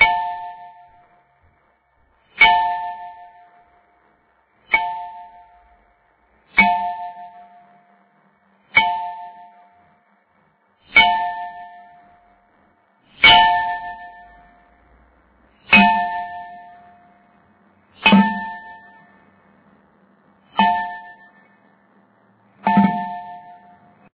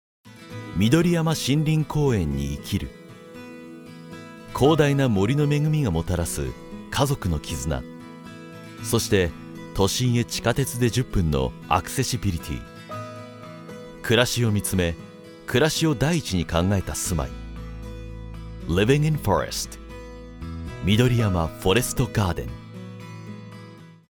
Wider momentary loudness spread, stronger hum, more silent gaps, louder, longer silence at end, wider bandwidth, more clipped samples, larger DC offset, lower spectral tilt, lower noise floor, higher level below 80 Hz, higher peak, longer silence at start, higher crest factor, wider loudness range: first, 26 LU vs 20 LU; neither; neither; first, -16 LUFS vs -23 LUFS; first, 0.65 s vs 0.15 s; second, 4 kHz vs 19.5 kHz; neither; neither; first, -8 dB/octave vs -5.5 dB/octave; first, -61 dBFS vs -44 dBFS; second, -52 dBFS vs -40 dBFS; first, 0 dBFS vs -4 dBFS; second, 0 s vs 0.25 s; about the same, 22 dB vs 20 dB; first, 9 LU vs 3 LU